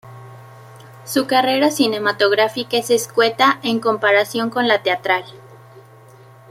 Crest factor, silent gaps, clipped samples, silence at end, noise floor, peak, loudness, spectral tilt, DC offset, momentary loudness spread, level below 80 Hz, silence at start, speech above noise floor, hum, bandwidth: 18 dB; none; under 0.1%; 0.7 s; -44 dBFS; -2 dBFS; -17 LUFS; -3 dB/octave; under 0.1%; 6 LU; -66 dBFS; 0.05 s; 27 dB; none; 16.5 kHz